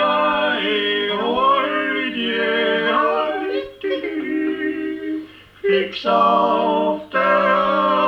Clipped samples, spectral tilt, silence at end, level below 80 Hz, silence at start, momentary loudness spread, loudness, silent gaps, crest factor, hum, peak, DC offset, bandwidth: under 0.1%; -6 dB/octave; 0 s; -56 dBFS; 0 s; 9 LU; -19 LUFS; none; 14 dB; none; -4 dBFS; under 0.1%; 7.4 kHz